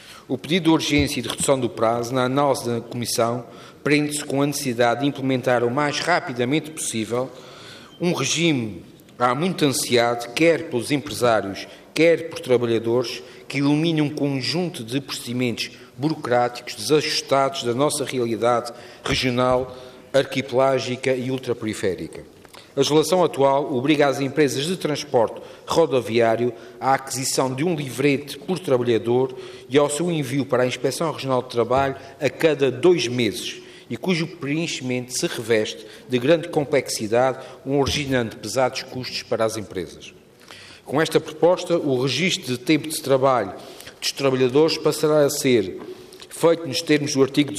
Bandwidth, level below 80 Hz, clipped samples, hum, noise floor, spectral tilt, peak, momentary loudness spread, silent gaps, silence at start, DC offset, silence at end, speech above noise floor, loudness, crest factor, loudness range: 15.5 kHz; -56 dBFS; under 0.1%; none; -45 dBFS; -4.5 dB/octave; -6 dBFS; 11 LU; none; 0 s; under 0.1%; 0 s; 23 dB; -22 LUFS; 16 dB; 3 LU